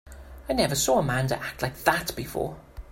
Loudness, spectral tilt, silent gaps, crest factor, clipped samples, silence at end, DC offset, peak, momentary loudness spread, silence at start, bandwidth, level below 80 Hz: -26 LUFS; -4 dB/octave; none; 22 dB; under 0.1%; 0.05 s; under 0.1%; -6 dBFS; 16 LU; 0.05 s; 16.5 kHz; -46 dBFS